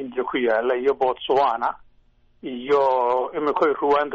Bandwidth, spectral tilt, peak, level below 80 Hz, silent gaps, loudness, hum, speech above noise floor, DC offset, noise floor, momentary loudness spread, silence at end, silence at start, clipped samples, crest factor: 7.2 kHz; -2 dB/octave; -10 dBFS; -58 dBFS; none; -21 LUFS; none; 36 dB; under 0.1%; -57 dBFS; 11 LU; 0 s; 0 s; under 0.1%; 12 dB